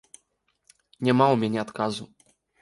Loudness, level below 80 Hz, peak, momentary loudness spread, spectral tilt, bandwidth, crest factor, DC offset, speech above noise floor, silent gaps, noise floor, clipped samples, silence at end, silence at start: -24 LUFS; -68 dBFS; -6 dBFS; 9 LU; -6.5 dB/octave; 11.5 kHz; 22 dB; under 0.1%; 49 dB; none; -72 dBFS; under 0.1%; 0.55 s; 1 s